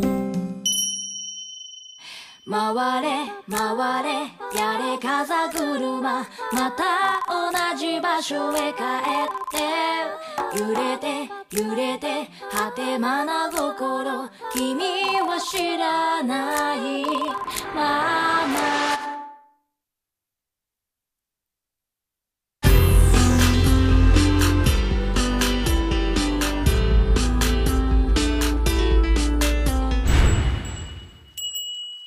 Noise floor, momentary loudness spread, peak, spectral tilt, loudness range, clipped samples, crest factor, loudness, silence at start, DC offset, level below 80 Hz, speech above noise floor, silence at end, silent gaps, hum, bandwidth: -86 dBFS; 11 LU; -6 dBFS; -4.5 dB/octave; 6 LU; under 0.1%; 16 dB; -22 LUFS; 0 s; under 0.1%; -26 dBFS; 62 dB; 0 s; none; none; 15.5 kHz